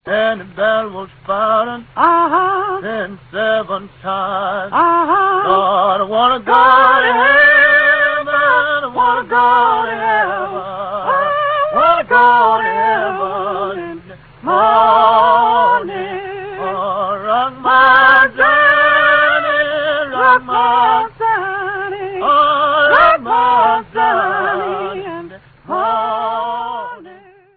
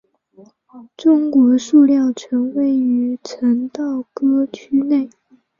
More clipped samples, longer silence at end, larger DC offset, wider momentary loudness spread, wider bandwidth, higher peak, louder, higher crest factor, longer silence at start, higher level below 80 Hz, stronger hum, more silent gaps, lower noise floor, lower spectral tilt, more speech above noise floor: neither; about the same, 0.45 s vs 0.5 s; neither; first, 14 LU vs 10 LU; second, 5.4 kHz vs 7.4 kHz; about the same, 0 dBFS vs -2 dBFS; first, -12 LUFS vs -16 LUFS; about the same, 14 dB vs 14 dB; second, 0.05 s vs 0.75 s; first, -50 dBFS vs -66 dBFS; neither; neither; second, -41 dBFS vs -48 dBFS; first, -7 dB/octave vs -5.5 dB/octave; second, 28 dB vs 32 dB